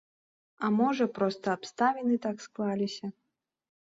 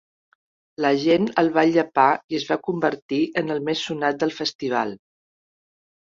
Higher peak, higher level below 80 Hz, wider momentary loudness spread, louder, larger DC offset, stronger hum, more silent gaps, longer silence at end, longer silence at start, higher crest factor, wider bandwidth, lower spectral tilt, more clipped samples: second, -14 dBFS vs -4 dBFS; second, -76 dBFS vs -66 dBFS; about the same, 8 LU vs 7 LU; second, -30 LUFS vs -22 LUFS; neither; neither; second, none vs 2.24-2.29 s, 3.02-3.09 s, 4.55-4.59 s; second, 0.75 s vs 1.15 s; second, 0.6 s vs 0.8 s; about the same, 18 dB vs 20 dB; about the same, 7.8 kHz vs 7.6 kHz; about the same, -6 dB/octave vs -5.5 dB/octave; neither